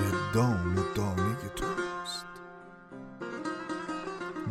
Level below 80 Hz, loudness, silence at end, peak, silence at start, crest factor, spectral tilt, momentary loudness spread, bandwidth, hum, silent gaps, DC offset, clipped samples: -52 dBFS; -32 LUFS; 0 s; -14 dBFS; 0 s; 18 dB; -6 dB/octave; 19 LU; 16 kHz; none; none; under 0.1%; under 0.1%